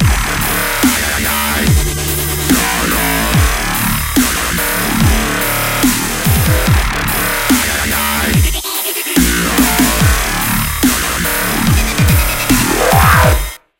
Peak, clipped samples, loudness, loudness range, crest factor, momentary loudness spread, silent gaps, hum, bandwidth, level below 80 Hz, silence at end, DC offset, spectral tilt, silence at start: 0 dBFS; under 0.1%; -12 LUFS; 1 LU; 12 dB; 4 LU; none; none; 17.5 kHz; -20 dBFS; 0.2 s; under 0.1%; -3.5 dB/octave; 0 s